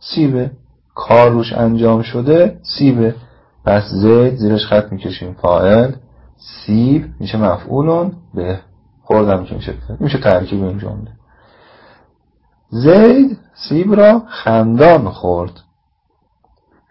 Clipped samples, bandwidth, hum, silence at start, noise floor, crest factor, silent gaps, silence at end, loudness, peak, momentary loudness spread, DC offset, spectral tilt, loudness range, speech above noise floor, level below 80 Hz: under 0.1%; 5.8 kHz; none; 0.05 s; -62 dBFS; 14 dB; none; 1.4 s; -13 LUFS; 0 dBFS; 16 LU; under 0.1%; -10 dB/octave; 7 LU; 50 dB; -38 dBFS